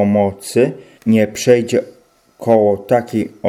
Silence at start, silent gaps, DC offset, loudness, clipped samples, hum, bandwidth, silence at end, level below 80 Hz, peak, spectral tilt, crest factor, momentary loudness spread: 0 s; none; under 0.1%; -16 LUFS; under 0.1%; none; 15.5 kHz; 0 s; -56 dBFS; 0 dBFS; -6 dB/octave; 16 dB; 7 LU